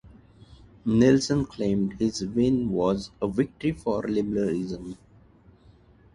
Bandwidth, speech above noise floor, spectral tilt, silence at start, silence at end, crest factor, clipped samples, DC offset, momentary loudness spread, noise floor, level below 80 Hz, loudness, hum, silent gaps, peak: 11 kHz; 31 dB; -6.5 dB/octave; 0.05 s; 1.2 s; 18 dB; under 0.1%; under 0.1%; 12 LU; -55 dBFS; -50 dBFS; -25 LUFS; none; none; -8 dBFS